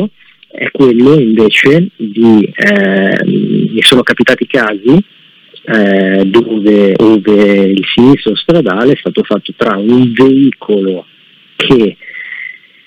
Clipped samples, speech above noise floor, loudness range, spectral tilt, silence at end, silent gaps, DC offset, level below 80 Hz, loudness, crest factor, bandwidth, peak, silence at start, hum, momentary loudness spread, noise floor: 2%; 30 dB; 3 LU; -6 dB/octave; 0.35 s; none; under 0.1%; -46 dBFS; -8 LUFS; 8 dB; 18.5 kHz; 0 dBFS; 0 s; none; 11 LU; -38 dBFS